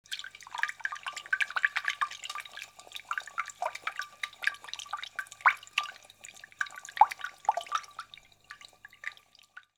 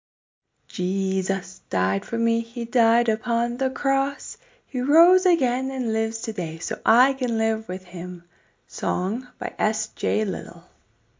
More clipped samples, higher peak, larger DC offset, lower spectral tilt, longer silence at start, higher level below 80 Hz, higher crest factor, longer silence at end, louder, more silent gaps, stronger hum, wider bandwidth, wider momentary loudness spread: neither; about the same, -6 dBFS vs -4 dBFS; neither; second, 1.5 dB/octave vs -5 dB/octave; second, 0.1 s vs 0.75 s; second, -80 dBFS vs -66 dBFS; first, 28 dB vs 20 dB; second, 0.2 s vs 0.6 s; second, -33 LUFS vs -24 LUFS; neither; first, 50 Hz at -75 dBFS vs none; first, 19 kHz vs 7.8 kHz; first, 22 LU vs 14 LU